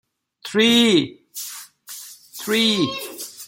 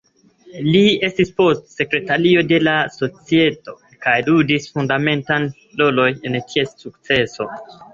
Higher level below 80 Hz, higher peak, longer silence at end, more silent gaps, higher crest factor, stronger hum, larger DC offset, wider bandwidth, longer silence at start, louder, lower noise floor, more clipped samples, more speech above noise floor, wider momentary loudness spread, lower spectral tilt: second, -66 dBFS vs -54 dBFS; about the same, -4 dBFS vs -2 dBFS; about the same, 0 s vs 0.1 s; neither; about the same, 18 dB vs 16 dB; neither; neither; first, 17 kHz vs 7.6 kHz; about the same, 0.45 s vs 0.45 s; about the same, -18 LUFS vs -17 LUFS; second, -40 dBFS vs -48 dBFS; neither; second, 22 dB vs 31 dB; first, 22 LU vs 10 LU; second, -3.5 dB/octave vs -6 dB/octave